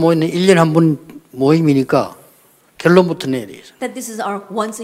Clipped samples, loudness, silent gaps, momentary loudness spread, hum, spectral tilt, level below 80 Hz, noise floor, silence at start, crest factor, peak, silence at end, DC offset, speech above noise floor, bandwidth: under 0.1%; -15 LUFS; none; 15 LU; none; -6.5 dB/octave; -58 dBFS; -51 dBFS; 0 s; 16 dB; 0 dBFS; 0 s; under 0.1%; 37 dB; 15.5 kHz